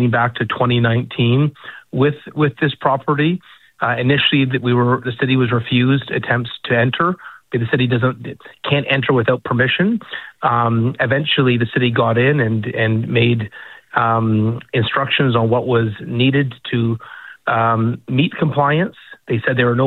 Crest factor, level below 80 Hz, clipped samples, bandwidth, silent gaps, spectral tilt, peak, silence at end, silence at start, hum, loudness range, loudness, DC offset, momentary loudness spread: 14 dB; -52 dBFS; under 0.1%; 4.2 kHz; none; -9 dB/octave; -2 dBFS; 0 s; 0 s; none; 2 LU; -17 LUFS; under 0.1%; 7 LU